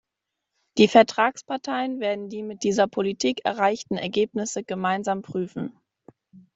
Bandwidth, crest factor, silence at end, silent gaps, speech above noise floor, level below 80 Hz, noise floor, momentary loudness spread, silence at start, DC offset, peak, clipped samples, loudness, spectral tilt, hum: 8 kHz; 22 dB; 0.15 s; none; 60 dB; -66 dBFS; -84 dBFS; 14 LU; 0.75 s; under 0.1%; -2 dBFS; under 0.1%; -24 LUFS; -4.5 dB/octave; none